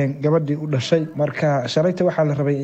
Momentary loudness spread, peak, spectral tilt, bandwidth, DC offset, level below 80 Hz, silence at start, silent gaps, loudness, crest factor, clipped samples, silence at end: 3 LU; -2 dBFS; -7 dB/octave; 8.2 kHz; under 0.1%; -62 dBFS; 0 s; none; -20 LUFS; 18 dB; under 0.1%; 0 s